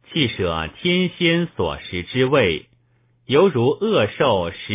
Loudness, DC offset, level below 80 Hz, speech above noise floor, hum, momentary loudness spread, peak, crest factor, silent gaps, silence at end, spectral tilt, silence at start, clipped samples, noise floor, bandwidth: -19 LUFS; under 0.1%; -44 dBFS; 41 dB; none; 8 LU; -4 dBFS; 16 dB; none; 0 s; -10 dB/octave; 0.1 s; under 0.1%; -60 dBFS; 3.9 kHz